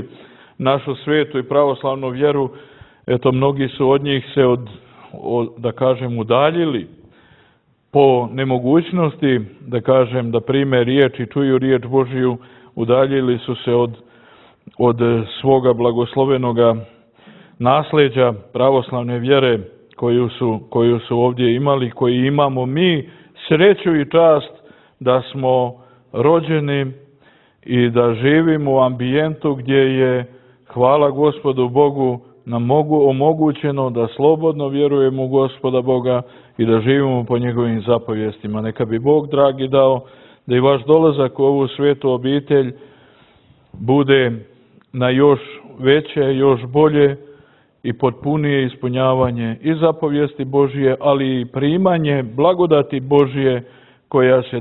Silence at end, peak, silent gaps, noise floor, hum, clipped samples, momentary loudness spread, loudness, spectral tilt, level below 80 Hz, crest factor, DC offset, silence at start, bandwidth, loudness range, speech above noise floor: 0 s; 0 dBFS; none; -57 dBFS; none; under 0.1%; 8 LU; -16 LUFS; -11 dB/octave; -54 dBFS; 16 dB; under 0.1%; 0 s; 4.1 kHz; 3 LU; 42 dB